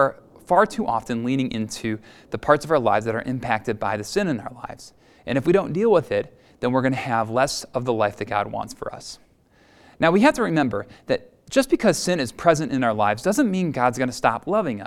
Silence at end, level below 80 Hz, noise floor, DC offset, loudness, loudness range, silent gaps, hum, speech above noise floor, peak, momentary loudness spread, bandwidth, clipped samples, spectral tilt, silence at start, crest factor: 0 s; -52 dBFS; -56 dBFS; under 0.1%; -22 LUFS; 3 LU; none; none; 35 dB; 0 dBFS; 12 LU; 16 kHz; under 0.1%; -5.5 dB/octave; 0 s; 22 dB